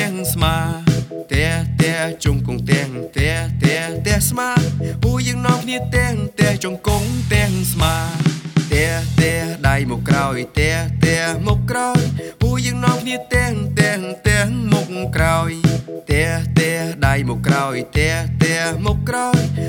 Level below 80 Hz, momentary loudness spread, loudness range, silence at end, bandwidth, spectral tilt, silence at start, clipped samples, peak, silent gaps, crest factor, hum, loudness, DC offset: -30 dBFS; 3 LU; 1 LU; 0 s; 19 kHz; -5 dB/octave; 0 s; under 0.1%; 0 dBFS; none; 16 dB; none; -18 LUFS; under 0.1%